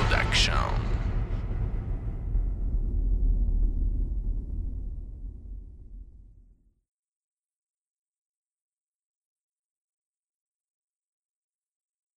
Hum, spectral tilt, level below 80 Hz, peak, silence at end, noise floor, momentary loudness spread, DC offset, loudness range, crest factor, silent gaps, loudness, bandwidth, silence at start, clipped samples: none; -4.5 dB/octave; -32 dBFS; -10 dBFS; 5.75 s; -59 dBFS; 21 LU; under 0.1%; 19 LU; 20 dB; none; -30 LUFS; 9.8 kHz; 0 s; under 0.1%